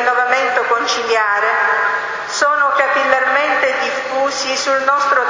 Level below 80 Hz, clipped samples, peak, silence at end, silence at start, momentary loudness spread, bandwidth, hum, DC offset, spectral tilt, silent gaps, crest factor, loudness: -60 dBFS; under 0.1%; 0 dBFS; 0 s; 0 s; 5 LU; 7.6 kHz; none; under 0.1%; -0.5 dB/octave; none; 16 dB; -15 LUFS